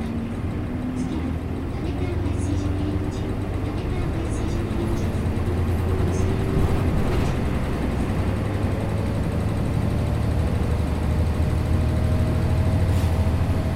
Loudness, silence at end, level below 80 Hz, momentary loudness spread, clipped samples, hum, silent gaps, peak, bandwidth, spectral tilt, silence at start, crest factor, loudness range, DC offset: -24 LUFS; 0 s; -28 dBFS; 5 LU; under 0.1%; none; none; -10 dBFS; 14 kHz; -7.5 dB/octave; 0 s; 12 dB; 4 LU; under 0.1%